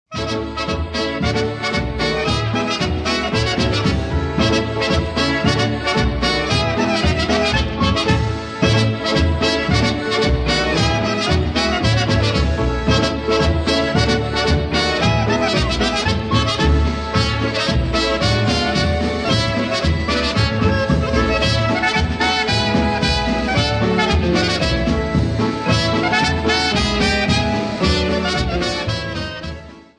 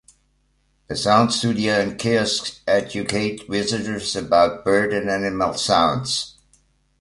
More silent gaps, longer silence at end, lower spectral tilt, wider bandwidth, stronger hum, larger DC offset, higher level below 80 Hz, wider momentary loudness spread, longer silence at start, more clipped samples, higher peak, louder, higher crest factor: neither; second, 0.15 s vs 0.7 s; about the same, -5 dB/octave vs -4 dB/octave; about the same, 11 kHz vs 11.5 kHz; neither; neither; first, -28 dBFS vs -50 dBFS; second, 4 LU vs 7 LU; second, 0.1 s vs 0.9 s; neither; about the same, -2 dBFS vs -2 dBFS; first, -17 LUFS vs -20 LUFS; about the same, 14 dB vs 18 dB